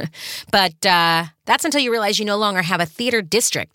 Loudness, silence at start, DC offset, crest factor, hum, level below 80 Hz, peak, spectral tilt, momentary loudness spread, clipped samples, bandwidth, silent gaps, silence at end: -18 LUFS; 0 s; under 0.1%; 18 dB; none; -60 dBFS; -2 dBFS; -2.5 dB/octave; 5 LU; under 0.1%; 17 kHz; none; 0.1 s